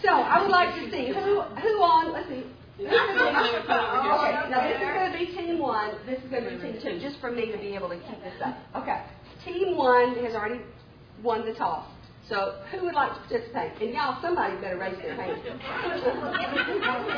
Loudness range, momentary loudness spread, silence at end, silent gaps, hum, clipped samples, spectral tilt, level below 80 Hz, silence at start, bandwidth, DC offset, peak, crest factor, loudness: 7 LU; 13 LU; 0 s; none; none; under 0.1%; -6 dB/octave; -58 dBFS; 0 s; 5.4 kHz; under 0.1%; -8 dBFS; 20 dB; -27 LUFS